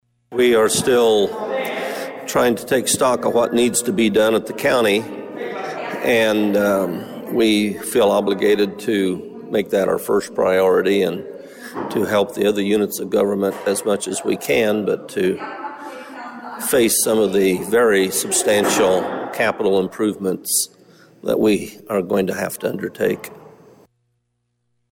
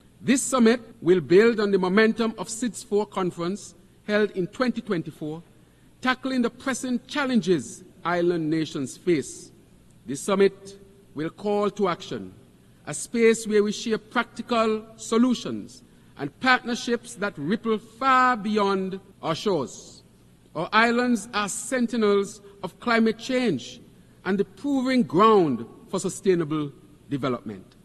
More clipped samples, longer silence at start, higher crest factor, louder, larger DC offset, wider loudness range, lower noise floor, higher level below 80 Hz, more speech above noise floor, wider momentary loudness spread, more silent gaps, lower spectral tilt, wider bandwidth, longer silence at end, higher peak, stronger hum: neither; about the same, 0.3 s vs 0.2 s; second, 14 dB vs 20 dB; first, -18 LUFS vs -24 LUFS; neither; about the same, 4 LU vs 5 LU; first, -71 dBFS vs -55 dBFS; about the same, -56 dBFS vs -60 dBFS; first, 53 dB vs 31 dB; second, 12 LU vs 16 LU; neither; about the same, -3.5 dB/octave vs -4.5 dB/octave; first, 17 kHz vs 12.5 kHz; first, 1.45 s vs 0.2 s; about the same, -6 dBFS vs -4 dBFS; neither